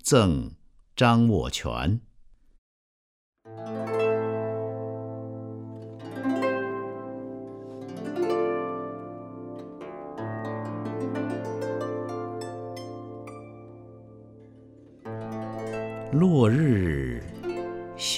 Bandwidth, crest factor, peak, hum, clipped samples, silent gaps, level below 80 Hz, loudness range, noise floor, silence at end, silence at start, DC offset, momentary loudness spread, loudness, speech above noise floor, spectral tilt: 15 kHz; 22 dB; -6 dBFS; none; under 0.1%; 2.58-3.33 s; -48 dBFS; 10 LU; -53 dBFS; 0 s; 0.05 s; under 0.1%; 19 LU; -28 LUFS; 32 dB; -6 dB/octave